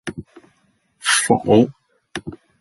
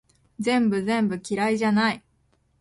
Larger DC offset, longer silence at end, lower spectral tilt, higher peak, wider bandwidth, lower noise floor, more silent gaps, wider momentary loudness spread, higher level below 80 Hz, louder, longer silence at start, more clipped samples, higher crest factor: neither; second, 0.25 s vs 0.6 s; second, -3.5 dB/octave vs -5.5 dB/octave; first, -2 dBFS vs -12 dBFS; about the same, 12 kHz vs 11.5 kHz; about the same, -63 dBFS vs -66 dBFS; neither; first, 20 LU vs 5 LU; first, -52 dBFS vs -62 dBFS; first, -17 LUFS vs -23 LUFS; second, 0.05 s vs 0.4 s; neither; about the same, 18 dB vs 14 dB